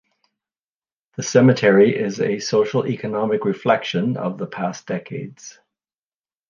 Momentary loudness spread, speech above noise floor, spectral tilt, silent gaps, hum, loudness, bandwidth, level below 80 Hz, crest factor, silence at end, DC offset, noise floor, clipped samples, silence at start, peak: 16 LU; over 71 dB; -6 dB/octave; none; none; -19 LUFS; 7.2 kHz; -66 dBFS; 18 dB; 1 s; under 0.1%; under -90 dBFS; under 0.1%; 1.2 s; -2 dBFS